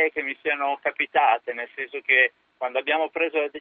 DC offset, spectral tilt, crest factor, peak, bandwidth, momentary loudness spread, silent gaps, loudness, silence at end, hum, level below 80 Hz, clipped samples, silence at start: under 0.1%; 2 dB/octave; 20 dB; -4 dBFS; 4.3 kHz; 12 LU; none; -23 LUFS; 0 s; none; -74 dBFS; under 0.1%; 0 s